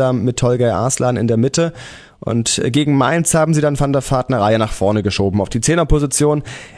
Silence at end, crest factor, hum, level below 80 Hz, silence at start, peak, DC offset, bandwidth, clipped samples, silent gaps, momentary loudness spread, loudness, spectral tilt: 0 s; 14 dB; none; -32 dBFS; 0 s; 0 dBFS; under 0.1%; 11 kHz; under 0.1%; none; 5 LU; -16 LUFS; -5 dB/octave